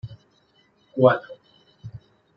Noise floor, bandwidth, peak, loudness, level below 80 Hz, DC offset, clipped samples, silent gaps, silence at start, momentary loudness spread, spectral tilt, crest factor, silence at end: -62 dBFS; 5.6 kHz; -4 dBFS; -21 LUFS; -62 dBFS; under 0.1%; under 0.1%; none; 0.05 s; 26 LU; -9.5 dB/octave; 22 dB; 0.4 s